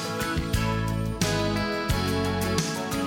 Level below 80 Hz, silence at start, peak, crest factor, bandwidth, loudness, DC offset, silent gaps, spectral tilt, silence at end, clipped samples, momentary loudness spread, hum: -36 dBFS; 0 s; -12 dBFS; 14 dB; 17.5 kHz; -26 LUFS; under 0.1%; none; -5 dB/octave; 0 s; under 0.1%; 3 LU; none